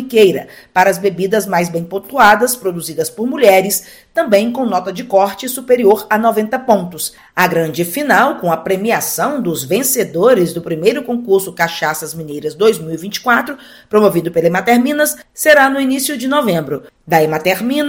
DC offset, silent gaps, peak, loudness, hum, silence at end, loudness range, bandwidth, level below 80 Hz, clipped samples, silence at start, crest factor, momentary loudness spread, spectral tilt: under 0.1%; none; 0 dBFS; -14 LUFS; none; 0 s; 2 LU; 17.5 kHz; -54 dBFS; 0.3%; 0 s; 14 dB; 10 LU; -4 dB/octave